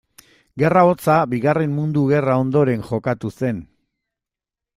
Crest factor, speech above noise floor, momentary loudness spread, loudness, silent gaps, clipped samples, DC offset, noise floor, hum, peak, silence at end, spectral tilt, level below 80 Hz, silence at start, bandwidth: 18 dB; 70 dB; 10 LU; -18 LUFS; none; under 0.1%; under 0.1%; -87 dBFS; none; -2 dBFS; 1.15 s; -8.5 dB/octave; -54 dBFS; 0.55 s; 15.5 kHz